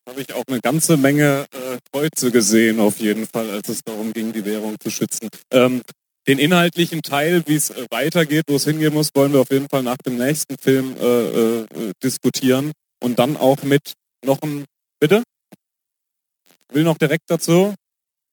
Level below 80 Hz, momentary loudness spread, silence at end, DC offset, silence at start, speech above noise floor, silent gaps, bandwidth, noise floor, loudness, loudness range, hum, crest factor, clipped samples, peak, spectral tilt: -66 dBFS; 11 LU; 0.55 s; under 0.1%; 0.05 s; 64 dB; none; over 20 kHz; -82 dBFS; -18 LUFS; 4 LU; none; 18 dB; under 0.1%; 0 dBFS; -4.5 dB/octave